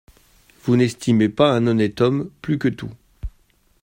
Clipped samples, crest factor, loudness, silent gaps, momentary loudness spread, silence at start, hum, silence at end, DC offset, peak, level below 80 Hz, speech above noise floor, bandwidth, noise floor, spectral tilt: under 0.1%; 18 dB; -19 LUFS; none; 21 LU; 0.65 s; none; 0.55 s; under 0.1%; -2 dBFS; -44 dBFS; 40 dB; 16 kHz; -58 dBFS; -7 dB/octave